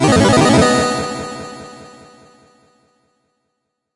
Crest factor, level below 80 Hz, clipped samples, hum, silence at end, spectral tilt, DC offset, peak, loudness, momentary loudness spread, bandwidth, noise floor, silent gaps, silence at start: 16 dB; -42 dBFS; under 0.1%; none; 2.1 s; -5 dB/octave; under 0.1%; -2 dBFS; -13 LUFS; 22 LU; 11.5 kHz; -74 dBFS; none; 0 s